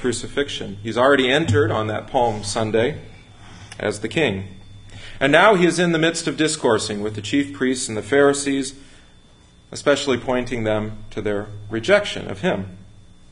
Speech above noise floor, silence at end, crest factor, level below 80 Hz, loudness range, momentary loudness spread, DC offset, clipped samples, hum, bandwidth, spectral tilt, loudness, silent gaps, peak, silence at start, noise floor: 30 dB; 0.4 s; 20 dB; -46 dBFS; 5 LU; 12 LU; under 0.1%; under 0.1%; none; 11 kHz; -4.5 dB/octave; -20 LUFS; none; 0 dBFS; 0 s; -50 dBFS